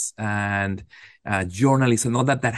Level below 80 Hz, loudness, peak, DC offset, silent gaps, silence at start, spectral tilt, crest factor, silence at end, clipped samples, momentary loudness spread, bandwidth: -56 dBFS; -22 LUFS; -6 dBFS; under 0.1%; none; 0 s; -5.5 dB/octave; 16 dB; 0 s; under 0.1%; 9 LU; 12.5 kHz